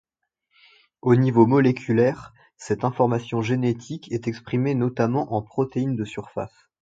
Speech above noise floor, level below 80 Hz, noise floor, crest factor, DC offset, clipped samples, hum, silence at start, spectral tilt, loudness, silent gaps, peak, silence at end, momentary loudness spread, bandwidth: 54 dB; -60 dBFS; -76 dBFS; 20 dB; under 0.1%; under 0.1%; none; 1.05 s; -8 dB/octave; -23 LUFS; none; -2 dBFS; 0.35 s; 14 LU; 7.8 kHz